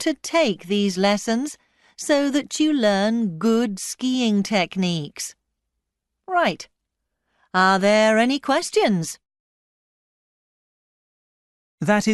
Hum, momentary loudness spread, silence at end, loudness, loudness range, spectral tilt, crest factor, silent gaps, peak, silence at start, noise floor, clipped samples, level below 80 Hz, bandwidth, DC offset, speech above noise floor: none; 11 LU; 0 s; -21 LUFS; 6 LU; -4.5 dB/octave; 18 dB; 9.40-11.78 s; -4 dBFS; 0 s; -80 dBFS; under 0.1%; -64 dBFS; 12 kHz; under 0.1%; 60 dB